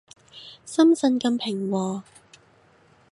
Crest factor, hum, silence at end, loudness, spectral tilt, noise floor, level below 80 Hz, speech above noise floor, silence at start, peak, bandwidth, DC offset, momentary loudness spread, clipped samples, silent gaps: 18 dB; none; 1.1 s; -23 LUFS; -5.5 dB/octave; -58 dBFS; -72 dBFS; 36 dB; 0.35 s; -8 dBFS; 11.5 kHz; under 0.1%; 23 LU; under 0.1%; none